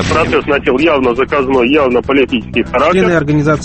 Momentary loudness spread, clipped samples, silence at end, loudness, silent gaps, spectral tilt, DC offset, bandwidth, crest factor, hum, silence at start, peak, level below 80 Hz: 3 LU; under 0.1%; 0 s; -11 LUFS; none; -6 dB/octave; under 0.1%; 8.8 kHz; 12 dB; none; 0 s; 0 dBFS; -32 dBFS